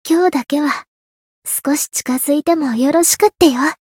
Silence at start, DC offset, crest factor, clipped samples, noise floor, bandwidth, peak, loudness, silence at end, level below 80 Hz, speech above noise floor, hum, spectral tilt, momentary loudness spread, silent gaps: 0.05 s; under 0.1%; 16 dB; under 0.1%; under -90 dBFS; 17.5 kHz; 0 dBFS; -15 LUFS; 0.2 s; -54 dBFS; over 75 dB; none; -2.5 dB/octave; 8 LU; 0.88-1.42 s